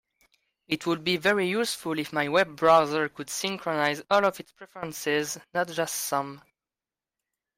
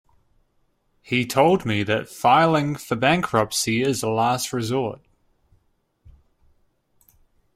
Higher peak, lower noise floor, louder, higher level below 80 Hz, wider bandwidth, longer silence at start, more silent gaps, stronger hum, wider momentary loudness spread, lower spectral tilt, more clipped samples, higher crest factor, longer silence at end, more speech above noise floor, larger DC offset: second, -8 dBFS vs -2 dBFS; first, under -90 dBFS vs -67 dBFS; second, -26 LUFS vs -21 LUFS; second, -70 dBFS vs -56 dBFS; about the same, 16 kHz vs 16 kHz; second, 0.7 s vs 1.1 s; neither; neither; first, 11 LU vs 8 LU; about the same, -3.5 dB/octave vs -4.5 dB/octave; neither; about the same, 20 dB vs 20 dB; second, 1.2 s vs 2.6 s; first, over 63 dB vs 46 dB; neither